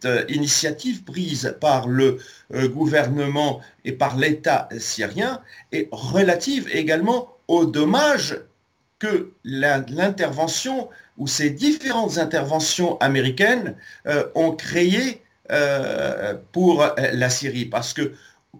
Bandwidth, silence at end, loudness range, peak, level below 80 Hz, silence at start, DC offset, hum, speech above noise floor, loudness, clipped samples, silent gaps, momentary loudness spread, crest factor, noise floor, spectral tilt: 17 kHz; 0 s; 2 LU; -4 dBFS; -62 dBFS; 0 s; under 0.1%; none; 45 dB; -21 LUFS; under 0.1%; none; 10 LU; 16 dB; -66 dBFS; -4 dB/octave